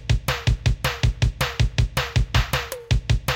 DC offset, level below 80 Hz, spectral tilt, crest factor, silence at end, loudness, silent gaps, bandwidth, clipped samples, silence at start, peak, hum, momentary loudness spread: under 0.1%; -26 dBFS; -4.5 dB/octave; 14 dB; 0 s; -23 LUFS; none; 17 kHz; under 0.1%; 0 s; -6 dBFS; none; 3 LU